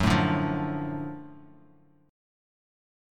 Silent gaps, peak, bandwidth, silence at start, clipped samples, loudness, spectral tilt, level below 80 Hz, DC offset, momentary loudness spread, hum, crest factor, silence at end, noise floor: none; -10 dBFS; 15.5 kHz; 0 s; under 0.1%; -28 LUFS; -6.5 dB/octave; -48 dBFS; under 0.1%; 19 LU; none; 22 dB; 1.65 s; -59 dBFS